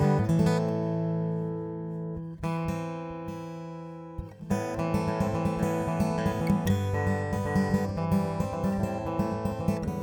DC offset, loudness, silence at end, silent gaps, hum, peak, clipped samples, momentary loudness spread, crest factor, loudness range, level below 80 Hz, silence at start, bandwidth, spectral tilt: under 0.1%; -29 LUFS; 0 s; none; none; -10 dBFS; under 0.1%; 12 LU; 18 dB; 6 LU; -46 dBFS; 0 s; 19 kHz; -7.5 dB/octave